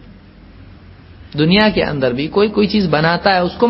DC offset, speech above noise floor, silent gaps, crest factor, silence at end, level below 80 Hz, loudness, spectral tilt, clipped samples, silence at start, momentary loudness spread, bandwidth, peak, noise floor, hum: under 0.1%; 26 dB; none; 16 dB; 0 s; -40 dBFS; -14 LUFS; -9 dB/octave; under 0.1%; 0.1 s; 6 LU; 5.8 kHz; 0 dBFS; -40 dBFS; none